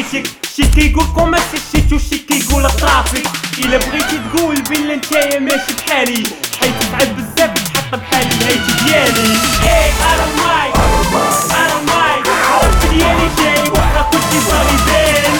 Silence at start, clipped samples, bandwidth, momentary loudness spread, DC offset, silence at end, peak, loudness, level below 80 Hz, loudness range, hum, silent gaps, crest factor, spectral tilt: 0 s; under 0.1%; 19.5 kHz; 5 LU; under 0.1%; 0 s; 0 dBFS; -12 LUFS; -20 dBFS; 3 LU; none; none; 12 dB; -3.5 dB/octave